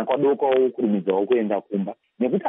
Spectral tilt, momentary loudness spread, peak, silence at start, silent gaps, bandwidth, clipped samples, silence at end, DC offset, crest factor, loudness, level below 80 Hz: -6 dB/octave; 9 LU; -10 dBFS; 0 s; none; 3.8 kHz; under 0.1%; 0 s; under 0.1%; 12 dB; -22 LUFS; -76 dBFS